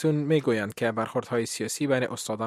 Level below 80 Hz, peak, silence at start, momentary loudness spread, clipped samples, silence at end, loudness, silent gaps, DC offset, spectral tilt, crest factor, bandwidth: -70 dBFS; -10 dBFS; 0 s; 5 LU; under 0.1%; 0 s; -27 LUFS; none; under 0.1%; -5 dB/octave; 18 dB; 15.5 kHz